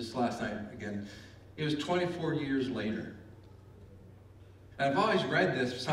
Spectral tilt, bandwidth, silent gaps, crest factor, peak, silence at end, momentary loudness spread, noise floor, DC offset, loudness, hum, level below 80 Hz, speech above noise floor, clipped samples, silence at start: -6 dB/octave; 14 kHz; none; 18 dB; -16 dBFS; 0 s; 21 LU; -54 dBFS; under 0.1%; -32 LUFS; none; -62 dBFS; 22 dB; under 0.1%; 0 s